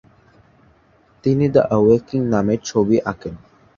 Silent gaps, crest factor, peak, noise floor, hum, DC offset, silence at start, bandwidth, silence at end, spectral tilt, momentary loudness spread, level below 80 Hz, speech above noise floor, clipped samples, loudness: none; 18 dB; -2 dBFS; -55 dBFS; none; under 0.1%; 1.25 s; 7.4 kHz; 0.4 s; -7.5 dB/octave; 12 LU; -48 dBFS; 38 dB; under 0.1%; -18 LUFS